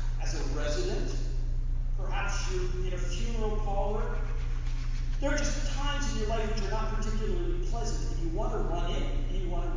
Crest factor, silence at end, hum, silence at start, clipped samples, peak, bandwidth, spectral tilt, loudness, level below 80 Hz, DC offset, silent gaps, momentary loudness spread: 12 dB; 0 s; none; 0 s; under 0.1%; -16 dBFS; 7.6 kHz; -5 dB/octave; -34 LUFS; -30 dBFS; under 0.1%; none; 4 LU